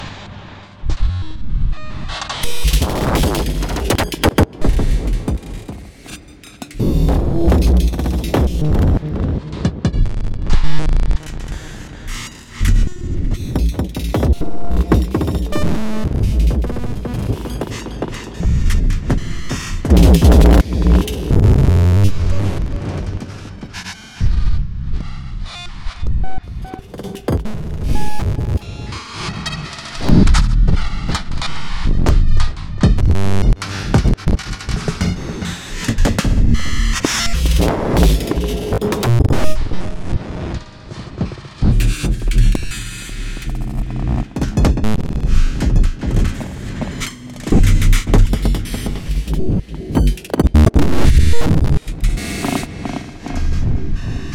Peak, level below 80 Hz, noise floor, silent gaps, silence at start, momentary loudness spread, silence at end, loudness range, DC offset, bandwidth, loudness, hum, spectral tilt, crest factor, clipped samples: -2 dBFS; -18 dBFS; -37 dBFS; none; 0 s; 14 LU; 0 s; 8 LU; under 0.1%; 17 kHz; -18 LUFS; none; -6 dB/octave; 12 dB; under 0.1%